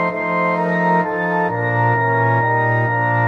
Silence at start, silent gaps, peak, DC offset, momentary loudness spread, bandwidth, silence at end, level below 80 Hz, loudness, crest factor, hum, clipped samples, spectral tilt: 0 s; none; -4 dBFS; under 0.1%; 3 LU; 5.2 kHz; 0 s; -60 dBFS; -17 LUFS; 12 dB; none; under 0.1%; -9 dB/octave